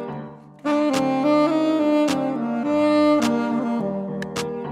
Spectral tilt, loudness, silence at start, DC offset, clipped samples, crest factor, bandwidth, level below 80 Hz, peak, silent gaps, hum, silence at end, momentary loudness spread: -5.5 dB/octave; -21 LUFS; 0 s; under 0.1%; under 0.1%; 14 dB; 13.5 kHz; -62 dBFS; -8 dBFS; none; none; 0 s; 10 LU